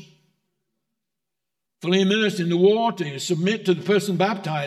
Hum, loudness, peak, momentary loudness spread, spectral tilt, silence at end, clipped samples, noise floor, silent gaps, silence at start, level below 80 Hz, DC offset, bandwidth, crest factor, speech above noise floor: none; -21 LUFS; -6 dBFS; 7 LU; -5.5 dB/octave; 0 s; under 0.1%; -85 dBFS; none; 1.8 s; -78 dBFS; under 0.1%; 13 kHz; 16 dB; 64 dB